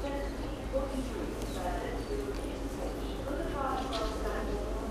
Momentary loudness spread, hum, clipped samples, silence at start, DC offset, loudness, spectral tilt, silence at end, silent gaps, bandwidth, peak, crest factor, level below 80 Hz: 4 LU; none; under 0.1%; 0 s; under 0.1%; -36 LUFS; -5.5 dB/octave; 0 s; none; 15 kHz; -20 dBFS; 14 dB; -40 dBFS